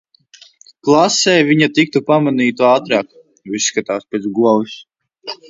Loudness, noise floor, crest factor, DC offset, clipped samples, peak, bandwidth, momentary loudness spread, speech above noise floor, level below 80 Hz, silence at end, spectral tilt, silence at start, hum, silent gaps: -14 LUFS; -46 dBFS; 16 dB; under 0.1%; under 0.1%; 0 dBFS; 8 kHz; 16 LU; 32 dB; -62 dBFS; 0.15 s; -4 dB/octave; 0.85 s; none; none